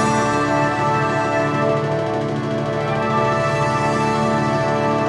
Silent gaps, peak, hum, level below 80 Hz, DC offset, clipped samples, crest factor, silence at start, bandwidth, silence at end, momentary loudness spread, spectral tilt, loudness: none; -6 dBFS; none; -46 dBFS; under 0.1%; under 0.1%; 12 dB; 0 s; 11.5 kHz; 0 s; 4 LU; -6 dB/octave; -19 LUFS